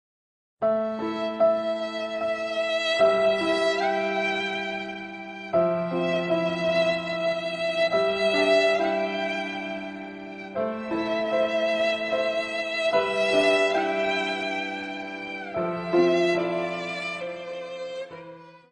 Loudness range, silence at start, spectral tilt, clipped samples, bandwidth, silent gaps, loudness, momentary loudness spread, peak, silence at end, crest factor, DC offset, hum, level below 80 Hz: 3 LU; 0.6 s; -4.5 dB/octave; under 0.1%; 10 kHz; none; -25 LUFS; 13 LU; -8 dBFS; 0.15 s; 18 dB; under 0.1%; none; -66 dBFS